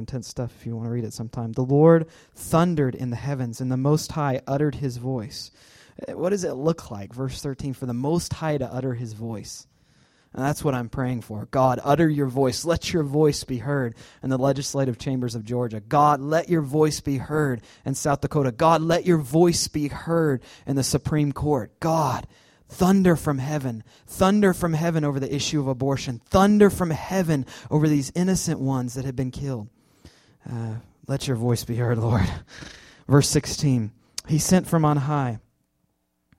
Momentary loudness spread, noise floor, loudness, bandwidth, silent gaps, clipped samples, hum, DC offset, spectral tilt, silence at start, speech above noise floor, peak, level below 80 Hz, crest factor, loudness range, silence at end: 13 LU; -72 dBFS; -23 LUFS; 16 kHz; none; under 0.1%; none; under 0.1%; -6 dB/octave; 0 s; 49 dB; -4 dBFS; -48 dBFS; 20 dB; 6 LU; 1 s